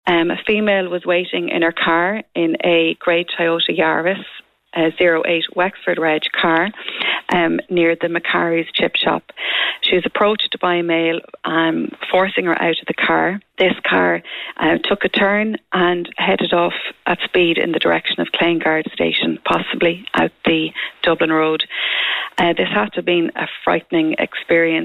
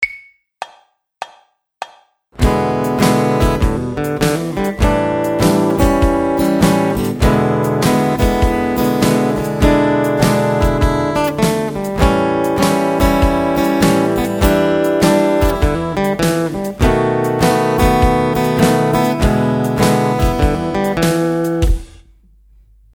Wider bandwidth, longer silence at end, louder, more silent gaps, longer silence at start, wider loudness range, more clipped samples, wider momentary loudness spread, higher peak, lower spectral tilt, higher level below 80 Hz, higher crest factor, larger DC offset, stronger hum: second, 7 kHz vs over 20 kHz; second, 0 s vs 1.1 s; about the same, -17 LUFS vs -15 LUFS; neither; about the same, 0.05 s vs 0 s; about the same, 1 LU vs 3 LU; neither; about the same, 5 LU vs 6 LU; second, -4 dBFS vs 0 dBFS; about the same, -6.5 dB/octave vs -6 dB/octave; second, -54 dBFS vs -24 dBFS; about the same, 12 dB vs 14 dB; neither; neither